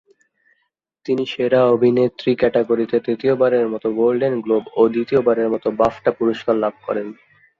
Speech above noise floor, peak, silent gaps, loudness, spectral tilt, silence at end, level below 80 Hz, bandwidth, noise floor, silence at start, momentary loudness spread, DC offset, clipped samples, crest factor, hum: 53 dB; -2 dBFS; none; -18 LUFS; -8 dB/octave; 0.45 s; -56 dBFS; 7 kHz; -71 dBFS; 1.05 s; 7 LU; under 0.1%; under 0.1%; 16 dB; none